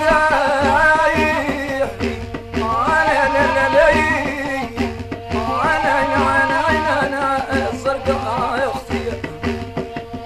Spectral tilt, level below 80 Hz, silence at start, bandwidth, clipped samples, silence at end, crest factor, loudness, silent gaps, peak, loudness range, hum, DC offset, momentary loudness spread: -5 dB/octave; -36 dBFS; 0 s; 14 kHz; under 0.1%; 0 s; 14 dB; -17 LUFS; none; -2 dBFS; 3 LU; none; under 0.1%; 11 LU